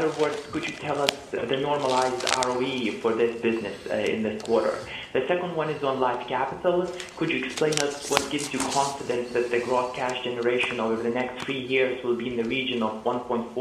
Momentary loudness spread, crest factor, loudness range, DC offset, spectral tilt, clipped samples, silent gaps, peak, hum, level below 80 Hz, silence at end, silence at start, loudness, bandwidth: 5 LU; 26 dB; 1 LU; under 0.1%; -3.5 dB/octave; under 0.1%; none; 0 dBFS; none; -58 dBFS; 0 s; 0 s; -26 LUFS; 15.5 kHz